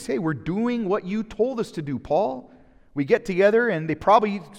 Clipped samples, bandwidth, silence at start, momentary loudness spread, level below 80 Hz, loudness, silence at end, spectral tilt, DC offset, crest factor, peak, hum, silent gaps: under 0.1%; 12.5 kHz; 0 s; 11 LU; -54 dBFS; -23 LUFS; 0 s; -7 dB/octave; under 0.1%; 18 dB; -4 dBFS; none; none